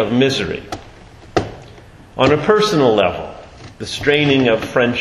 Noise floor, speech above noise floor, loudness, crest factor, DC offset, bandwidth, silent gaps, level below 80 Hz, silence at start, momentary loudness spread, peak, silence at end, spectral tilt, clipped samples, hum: -40 dBFS; 25 dB; -16 LUFS; 16 dB; under 0.1%; 13 kHz; none; -42 dBFS; 0 s; 19 LU; 0 dBFS; 0 s; -5.5 dB/octave; under 0.1%; none